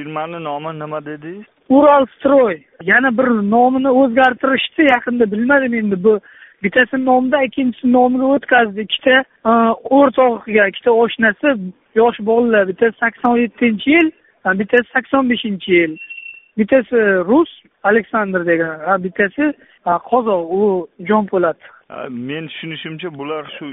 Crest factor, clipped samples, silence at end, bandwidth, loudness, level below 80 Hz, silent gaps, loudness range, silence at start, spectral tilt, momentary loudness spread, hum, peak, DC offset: 16 dB; under 0.1%; 0 s; 4 kHz; -15 LUFS; -56 dBFS; none; 4 LU; 0 s; -3.5 dB/octave; 13 LU; none; 0 dBFS; under 0.1%